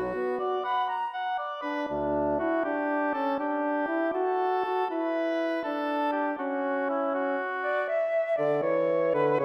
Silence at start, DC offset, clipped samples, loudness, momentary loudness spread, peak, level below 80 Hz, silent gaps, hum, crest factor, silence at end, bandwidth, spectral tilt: 0 s; under 0.1%; under 0.1%; -28 LUFS; 4 LU; -16 dBFS; -60 dBFS; none; none; 12 dB; 0 s; 6.2 kHz; -7 dB/octave